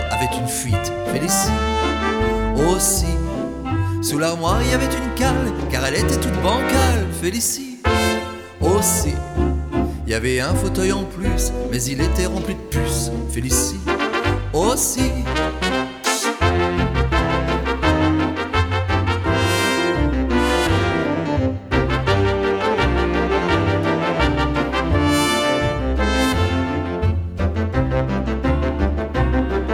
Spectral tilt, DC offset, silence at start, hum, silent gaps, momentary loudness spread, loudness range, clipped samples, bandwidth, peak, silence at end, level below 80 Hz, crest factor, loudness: -4.5 dB/octave; under 0.1%; 0 s; none; none; 5 LU; 2 LU; under 0.1%; 19 kHz; -4 dBFS; 0 s; -26 dBFS; 14 dB; -19 LUFS